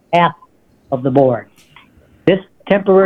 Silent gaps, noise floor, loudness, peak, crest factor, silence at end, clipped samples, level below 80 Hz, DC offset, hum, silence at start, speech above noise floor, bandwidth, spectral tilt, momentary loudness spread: none; -50 dBFS; -16 LUFS; 0 dBFS; 16 dB; 0 s; under 0.1%; -56 dBFS; under 0.1%; none; 0.1 s; 37 dB; 6.2 kHz; -8.5 dB/octave; 8 LU